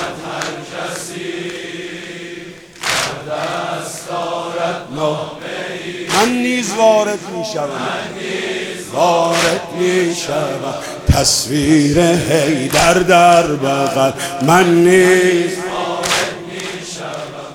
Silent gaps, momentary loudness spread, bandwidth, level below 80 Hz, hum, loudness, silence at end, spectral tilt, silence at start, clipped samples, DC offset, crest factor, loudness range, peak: none; 15 LU; 18 kHz; -38 dBFS; none; -15 LUFS; 0 s; -4 dB/octave; 0 s; under 0.1%; under 0.1%; 16 dB; 10 LU; 0 dBFS